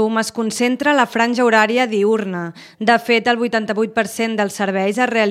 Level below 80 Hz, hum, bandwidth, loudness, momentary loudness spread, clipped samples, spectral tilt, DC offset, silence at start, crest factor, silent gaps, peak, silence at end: -66 dBFS; none; 15.5 kHz; -17 LUFS; 6 LU; under 0.1%; -4 dB/octave; under 0.1%; 0 s; 16 dB; none; 0 dBFS; 0 s